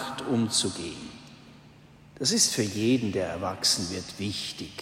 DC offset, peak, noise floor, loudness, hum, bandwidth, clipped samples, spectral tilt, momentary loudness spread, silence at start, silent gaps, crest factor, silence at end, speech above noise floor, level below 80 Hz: under 0.1%; -8 dBFS; -52 dBFS; -26 LUFS; none; 16 kHz; under 0.1%; -3 dB/octave; 14 LU; 0 s; none; 20 dB; 0 s; 25 dB; -60 dBFS